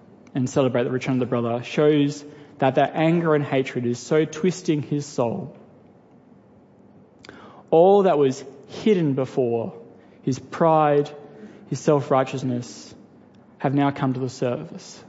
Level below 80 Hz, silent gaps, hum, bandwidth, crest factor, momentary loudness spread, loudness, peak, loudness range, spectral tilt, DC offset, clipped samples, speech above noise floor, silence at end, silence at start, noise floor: -68 dBFS; none; none; 8 kHz; 18 dB; 14 LU; -22 LUFS; -4 dBFS; 5 LU; -6.5 dB/octave; under 0.1%; under 0.1%; 30 dB; 0.1 s; 0.35 s; -52 dBFS